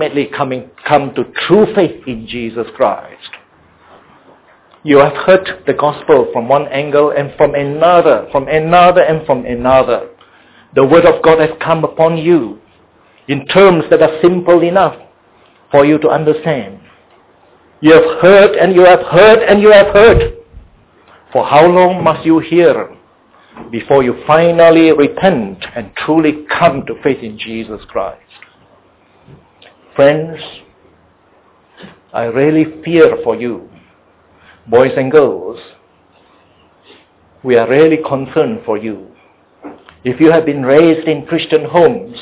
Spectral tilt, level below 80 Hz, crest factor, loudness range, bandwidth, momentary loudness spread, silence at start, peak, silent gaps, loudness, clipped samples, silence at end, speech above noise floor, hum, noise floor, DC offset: -10 dB/octave; -38 dBFS; 12 dB; 9 LU; 4 kHz; 16 LU; 0 s; 0 dBFS; none; -10 LUFS; 0.3%; 0 s; 39 dB; none; -49 dBFS; under 0.1%